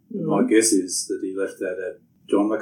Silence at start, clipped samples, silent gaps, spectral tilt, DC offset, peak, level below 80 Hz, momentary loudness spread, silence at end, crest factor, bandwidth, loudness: 0.1 s; under 0.1%; none; -3.5 dB/octave; under 0.1%; -6 dBFS; -80 dBFS; 11 LU; 0 s; 18 dB; 17.5 kHz; -22 LUFS